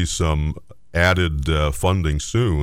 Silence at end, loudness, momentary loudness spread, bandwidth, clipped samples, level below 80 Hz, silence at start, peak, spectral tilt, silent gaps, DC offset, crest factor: 0 s; -20 LUFS; 9 LU; 16 kHz; under 0.1%; -28 dBFS; 0 s; -4 dBFS; -5 dB/octave; none; 0.5%; 14 dB